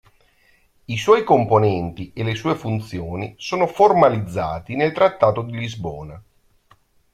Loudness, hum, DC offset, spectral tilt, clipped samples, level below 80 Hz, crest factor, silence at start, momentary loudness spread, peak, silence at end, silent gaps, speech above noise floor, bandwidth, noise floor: -19 LUFS; none; under 0.1%; -6.5 dB/octave; under 0.1%; -50 dBFS; 18 dB; 0.9 s; 14 LU; -2 dBFS; 0.95 s; none; 39 dB; 13 kHz; -58 dBFS